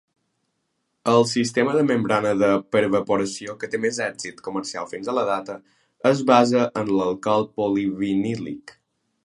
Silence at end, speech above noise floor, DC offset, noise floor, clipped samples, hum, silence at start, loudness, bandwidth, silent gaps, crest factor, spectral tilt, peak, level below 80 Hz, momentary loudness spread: 0.55 s; 53 dB; under 0.1%; -74 dBFS; under 0.1%; none; 1.05 s; -22 LUFS; 11.5 kHz; none; 22 dB; -5 dB/octave; 0 dBFS; -62 dBFS; 12 LU